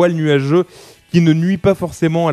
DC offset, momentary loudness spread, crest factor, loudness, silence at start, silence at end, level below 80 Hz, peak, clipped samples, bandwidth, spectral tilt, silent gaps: under 0.1%; 4 LU; 14 dB; -15 LUFS; 0 s; 0 s; -46 dBFS; 0 dBFS; under 0.1%; 13 kHz; -7.5 dB/octave; none